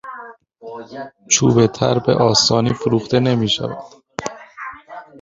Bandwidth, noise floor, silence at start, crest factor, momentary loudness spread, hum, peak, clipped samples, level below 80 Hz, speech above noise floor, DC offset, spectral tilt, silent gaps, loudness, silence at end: 7.8 kHz; -38 dBFS; 0.05 s; 18 dB; 21 LU; none; 0 dBFS; under 0.1%; -50 dBFS; 22 dB; under 0.1%; -4.5 dB/octave; none; -16 LUFS; 0 s